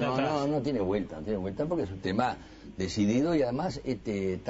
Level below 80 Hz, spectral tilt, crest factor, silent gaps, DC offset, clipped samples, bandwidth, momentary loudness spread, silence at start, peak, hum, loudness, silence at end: -52 dBFS; -6.5 dB/octave; 20 dB; none; under 0.1%; under 0.1%; 8 kHz; 7 LU; 0 s; -10 dBFS; none; -30 LUFS; 0 s